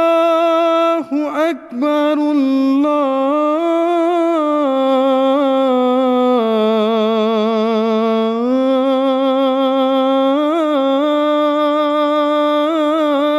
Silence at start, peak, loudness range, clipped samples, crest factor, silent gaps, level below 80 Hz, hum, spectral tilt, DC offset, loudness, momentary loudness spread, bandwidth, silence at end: 0 s; -6 dBFS; 1 LU; under 0.1%; 8 dB; none; -66 dBFS; none; -6 dB/octave; under 0.1%; -15 LUFS; 2 LU; 12.5 kHz; 0 s